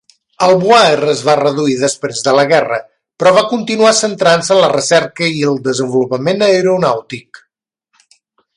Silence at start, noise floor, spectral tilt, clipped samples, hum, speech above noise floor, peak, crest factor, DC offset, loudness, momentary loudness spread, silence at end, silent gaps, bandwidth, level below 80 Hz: 0.4 s; -64 dBFS; -4 dB/octave; under 0.1%; none; 53 dB; 0 dBFS; 12 dB; under 0.1%; -12 LUFS; 7 LU; 1.35 s; none; 11.5 kHz; -58 dBFS